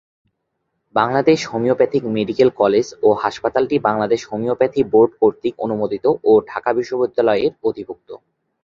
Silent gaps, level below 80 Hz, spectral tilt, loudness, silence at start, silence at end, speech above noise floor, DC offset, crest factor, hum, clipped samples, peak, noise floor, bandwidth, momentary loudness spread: none; -56 dBFS; -6 dB/octave; -18 LUFS; 0.95 s; 0.45 s; 56 dB; under 0.1%; 16 dB; none; under 0.1%; -2 dBFS; -73 dBFS; 7.6 kHz; 8 LU